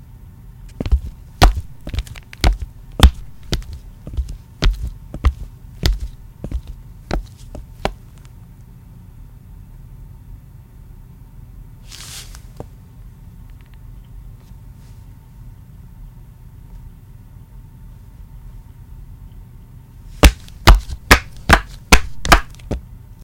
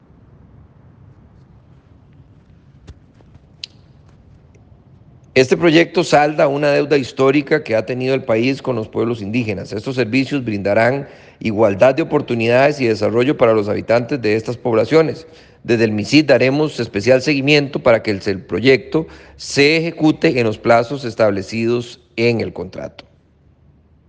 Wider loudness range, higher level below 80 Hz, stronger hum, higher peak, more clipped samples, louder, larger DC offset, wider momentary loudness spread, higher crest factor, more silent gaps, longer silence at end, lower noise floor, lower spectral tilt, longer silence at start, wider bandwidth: first, 25 LU vs 4 LU; first, -24 dBFS vs -52 dBFS; neither; about the same, 0 dBFS vs 0 dBFS; first, 0.2% vs under 0.1%; about the same, -18 LUFS vs -16 LUFS; neither; first, 27 LU vs 10 LU; about the same, 20 dB vs 16 dB; neither; second, 0.25 s vs 1.2 s; second, -40 dBFS vs -52 dBFS; second, -4 dB/octave vs -6 dB/octave; second, 0.45 s vs 2.9 s; first, 17 kHz vs 9.6 kHz